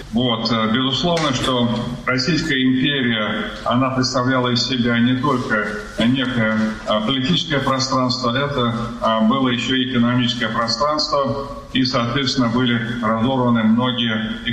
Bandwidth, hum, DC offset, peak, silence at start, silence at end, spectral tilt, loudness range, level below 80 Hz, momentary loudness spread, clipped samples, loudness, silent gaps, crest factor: 11.5 kHz; none; under 0.1%; -4 dBFS; 0 s; 0 s; -5 dB/octave; 1 LU; -42 dBFS; 4 LU; under 0.1%; -18 LUFS; none; 14 dB